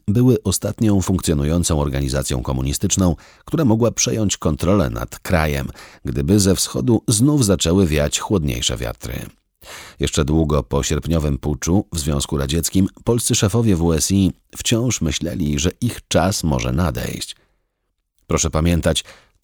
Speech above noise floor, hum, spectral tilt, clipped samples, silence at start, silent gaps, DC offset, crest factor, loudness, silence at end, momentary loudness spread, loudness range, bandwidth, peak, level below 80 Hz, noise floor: 54 dB; none; -5 dB/octave; under 0.1%; 0.05 s; none; under 0.1%; 16 dB; -19 LUFS; 0.3 s; 10 LU; 4 LU; over 20 kHz; -2 dBFS; -30 dBFS; -73 dBFS